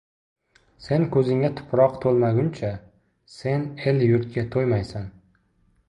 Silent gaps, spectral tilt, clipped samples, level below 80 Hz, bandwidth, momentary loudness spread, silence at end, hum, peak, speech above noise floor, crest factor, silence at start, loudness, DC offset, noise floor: none; -9 dB/octave; under 0.1%; -52 dBFS; 10.5 kHz; 12 LU; 0.8 s; none; -6 dBFS; 42 dB; 18 dB; 0.8 s; -23 LUFS; under 0.1%; -64 dBFS